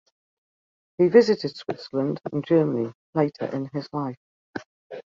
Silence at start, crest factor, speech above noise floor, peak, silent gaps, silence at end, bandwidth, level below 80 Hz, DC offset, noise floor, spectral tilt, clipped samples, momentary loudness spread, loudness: 1 s; 22 dB; over 67 dB; -4 dBFS; 2.94-3.13 s, 4.17-4.53 s, 4.66-4.90 s; 0.1 s; 7.4 kHz; -68 dBFS; under 0.1%; under -90 dBFS; -7.5 dB/octave; under 0.1%; 21 LU; -24 LUFS